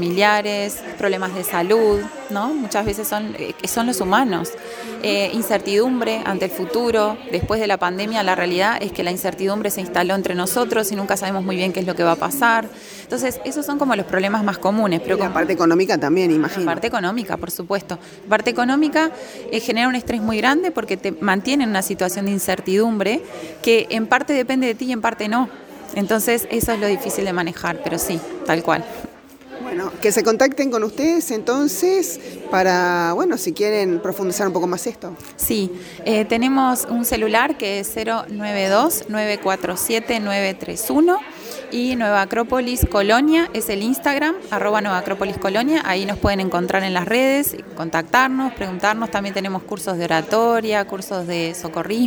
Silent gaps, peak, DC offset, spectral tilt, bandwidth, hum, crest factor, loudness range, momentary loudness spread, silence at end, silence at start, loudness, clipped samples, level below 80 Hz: none; -2 dBFS; under 0.1%; -4 dB/octave; over 20 kHz; none; 18 dB; 2 LU; 8 LU; 0 s; 0 s; -20 LUFS; under 0.1%; -44 dBFS